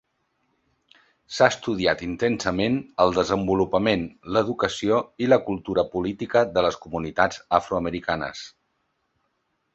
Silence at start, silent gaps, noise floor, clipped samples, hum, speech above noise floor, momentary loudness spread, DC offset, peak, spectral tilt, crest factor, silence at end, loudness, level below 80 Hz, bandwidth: 1.3 s; none; -73 dBFS; under 0.1%; none; 50 dB; 7 LU; under 0.1%; -2 dBFS; -5 dB/octave; 22 dB; 1.25 s; -23 LUFS; -50 dBFS; 8.2 kHz